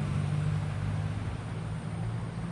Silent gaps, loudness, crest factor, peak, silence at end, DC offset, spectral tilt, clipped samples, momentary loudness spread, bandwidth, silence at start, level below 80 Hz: none; -34 LUFS; 12 dB; -20 dBFS; 0 s; under 0.1%; -7.5 dB/octave; under 0.1%; 6 LU; 11 kHz; 0 s; -46 dBFS